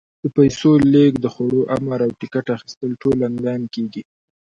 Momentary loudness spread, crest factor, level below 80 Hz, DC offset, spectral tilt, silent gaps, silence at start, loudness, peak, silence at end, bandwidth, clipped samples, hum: 13 LU; 16 dB; -50 dBFS; under 0.1%; -7.5 dB/octave; 2.77-2.81 s; 0.25 s; -18 LUFS; -2 dBFS; 0.4 s; 7.6 kHz; under 0.1%; none